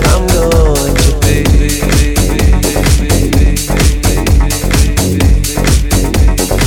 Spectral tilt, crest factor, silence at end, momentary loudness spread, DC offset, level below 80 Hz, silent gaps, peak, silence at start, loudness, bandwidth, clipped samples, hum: -5 dB/octave; 8 dB; 0 s; 2 LU; under 0.1%; -12 dBFS; none; 0 dBFS; 0 s; -11 LUFS; 18.5 kHz; 0.1%; none